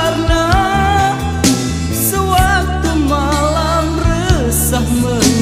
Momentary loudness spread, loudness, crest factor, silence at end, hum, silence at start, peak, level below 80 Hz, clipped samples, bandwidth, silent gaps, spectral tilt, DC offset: 3 LU; -14 LUFS; 14 dB; 0 s; none; 0 s; 0 dBFS; -22 dBFS; under 0.1%; 16 kHz; none; -4.5 dB/octave; under 0.1%